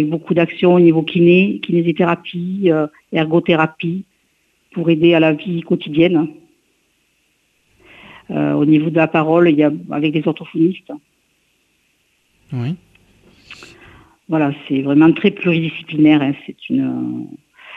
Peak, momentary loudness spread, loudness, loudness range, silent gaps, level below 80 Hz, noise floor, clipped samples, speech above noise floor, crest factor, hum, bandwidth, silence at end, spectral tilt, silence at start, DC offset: 0 dBFS; 14 LU; -15 LUFS; 10 LU; none; -58 dBFS; -62 dBFS; under 0.1%; 47 dB; 16 dB; none; 4.7 kHz; 0 s; -9 dB/octave; 0 s; under 0.1%